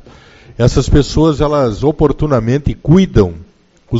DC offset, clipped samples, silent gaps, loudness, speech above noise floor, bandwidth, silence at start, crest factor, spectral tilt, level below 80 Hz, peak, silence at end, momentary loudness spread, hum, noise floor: under 0.1%; 0.3%; none; -13 LUFS; 28 dB; 8 kHz; 0.6 s; 12 dB; -7.5 dB/octave; -24 dBFS; 0 dBFS; 0 s; 5 LU; none; -40 dBFS